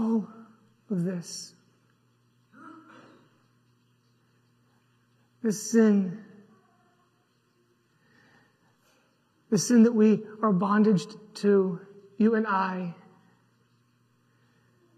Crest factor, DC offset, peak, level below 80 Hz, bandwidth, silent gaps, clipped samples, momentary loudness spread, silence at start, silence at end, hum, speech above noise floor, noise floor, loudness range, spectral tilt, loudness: 20 dB; under 0.1%; -10 dBFS; -82 dBFS; 13.5 kHz; none; under 0.1%; 20 LU; 0 s; 2.05 s; none; 45 dB; -69 dBFS; 14 LU; -6 dB/octave; -25 LUFS